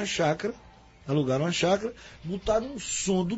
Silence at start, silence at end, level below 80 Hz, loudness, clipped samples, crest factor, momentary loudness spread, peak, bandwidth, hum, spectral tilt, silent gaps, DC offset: 0 s; 0 s; -50 dBFS; -28 LUFS; under 0.1%; 18 dB; 13 LU; -10 dBFS; 8 kHz; none; -4.5 dB/octave; none; under 0.1%